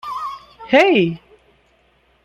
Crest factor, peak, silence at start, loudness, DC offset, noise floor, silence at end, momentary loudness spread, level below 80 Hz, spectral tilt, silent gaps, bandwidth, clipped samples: 18 dB; -2 dBFS; 0.05 s; -16 LUFS; under 0.1%; -58 dBFS; 1.05 s; 22 LU; -58 dBFS; -6 dB/octave; none; 12 kHz; under 0.1%